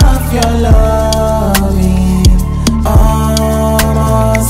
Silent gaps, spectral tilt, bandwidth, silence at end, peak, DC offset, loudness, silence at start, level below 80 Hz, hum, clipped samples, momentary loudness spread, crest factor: none; -6 dB/octave; 16.5 kHz; 0 s; 0 dBFS; under 0.1%; -11 LUFS; 0 s; -12 dBFS; none; 0.4%; 3 LU; 8 dB